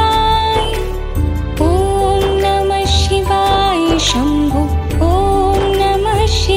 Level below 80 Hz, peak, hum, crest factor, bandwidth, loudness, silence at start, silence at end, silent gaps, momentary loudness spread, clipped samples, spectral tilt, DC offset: -20 dBFS; -2 dBFS; none; 12 dB; 16 kHz; -14 LUFS; 0 s; 0 s; none; 5 LU; under 0.1%; -5 dB/octave; under 0.1%